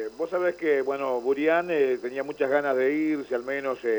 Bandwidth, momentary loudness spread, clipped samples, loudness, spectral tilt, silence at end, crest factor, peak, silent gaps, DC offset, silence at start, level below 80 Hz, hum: over 20 kHz; 6 LU; under 0.1%; -26 LUFS; -6 dB/octave; 0 s; 14 dB; -12 dBFS; none; under 0.1%; 0 s; -68 dBFS; none